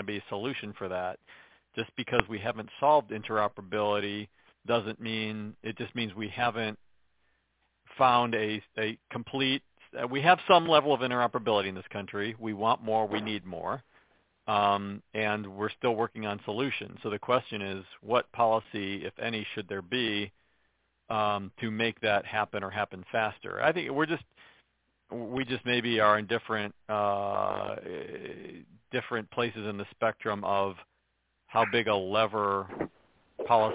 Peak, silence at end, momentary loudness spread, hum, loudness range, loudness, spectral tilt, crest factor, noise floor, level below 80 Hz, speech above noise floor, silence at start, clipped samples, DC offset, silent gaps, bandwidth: 0 dBFS; 0 s; 13 LU; none; 7 LU; -30 LUFS; -2.5 dB/octave; 30 dB; -76 dBFS; -64 dBFS; 46 dB; 0 s; under 0.1%; under 0.1%; none; 4 kHz